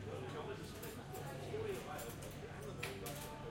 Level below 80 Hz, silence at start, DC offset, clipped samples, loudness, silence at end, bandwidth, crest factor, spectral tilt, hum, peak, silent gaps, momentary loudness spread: -62 dBFS; 0 s; under 0.1%; under 0.1%; -47 LUFS; 0 s; 16.5 kHz; 20 dB; -5 dB/octave; none; -26 dBFS; none; 5 LU